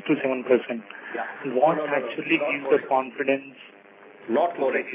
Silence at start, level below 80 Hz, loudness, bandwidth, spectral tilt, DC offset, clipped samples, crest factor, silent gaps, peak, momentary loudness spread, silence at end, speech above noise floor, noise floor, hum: 0 s; -84 dBFS; -25 LUFS; 3.8 kHz; -9 dB/octave; under 0.1%; under 0.1%; 18 dB; none; -6 dBFS; 11 LU; 0 s; 24 dB; -48 dBFS; none